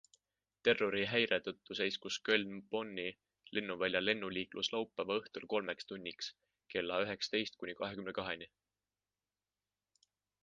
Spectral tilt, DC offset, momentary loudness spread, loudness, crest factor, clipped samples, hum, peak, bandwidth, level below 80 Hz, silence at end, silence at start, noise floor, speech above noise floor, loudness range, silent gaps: -3.5 dB/octave; under 0.1%; 10 LU; -38 LUFS; 24 dB; under 0.1%; 50 Hz at -70 dBFS; -14 dBFS; 9 kHz; -74 dBFS; 1.95 s; 0.65 s; under -90 dBFS; over 52 dB; 5 LU; none